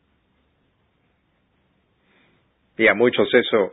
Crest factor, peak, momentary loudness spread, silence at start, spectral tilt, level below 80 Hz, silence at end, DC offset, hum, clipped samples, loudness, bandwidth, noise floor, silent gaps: 20 dB; -4 dBFS; 5 LU; 2.8 s; -9.5 dB/octave; -64 dBFS; 0 s; under 0.1%; none; under 0.1%; -17 LUFS; 4 kHz; -66 dBFS; none